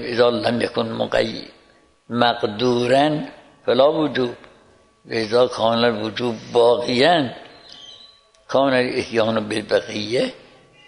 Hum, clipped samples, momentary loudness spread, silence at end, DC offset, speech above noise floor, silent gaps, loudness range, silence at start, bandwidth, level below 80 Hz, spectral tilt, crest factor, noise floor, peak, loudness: none; under 0.1%; 12 LU; 0.5 s; under 0.1%; 36 dB; none; 2 LU; 0 s; 11 kHz; -56 dBFS; -5 dB/octave; 20 dB; -55 dBFS; 0 dBFS; -20 LUFS